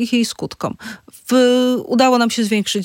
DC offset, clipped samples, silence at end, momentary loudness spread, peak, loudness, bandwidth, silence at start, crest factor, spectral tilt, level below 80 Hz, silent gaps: under 0.1%; under 0.1%; 0 s; 16 LU; 0 dBFS; -16 LUFS; 17 kHz; 0 s; 16 dB; -4 dB/octave; -60 dBFS; none